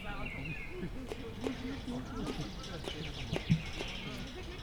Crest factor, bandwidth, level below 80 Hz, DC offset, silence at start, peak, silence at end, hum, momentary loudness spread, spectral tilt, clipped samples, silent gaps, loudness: 22 dB; 19.5 kHz; -46 dBFS; under 0.1%; 0 s; -16 dBFS; 0 s; none; 9 LU; -5.5 dB/octave; under 0.1%; none; -40 LUFS